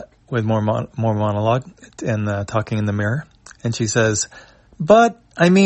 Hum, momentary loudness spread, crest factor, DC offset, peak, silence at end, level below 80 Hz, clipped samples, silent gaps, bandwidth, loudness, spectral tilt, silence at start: none; 13 LU; 18 dB; under 0.1%; -2 dBFS; 0 s; -52 dBFS; under 0.1%; none; 8.6 kHz; -19 LUFS; -5.5 dB/octave; 0 s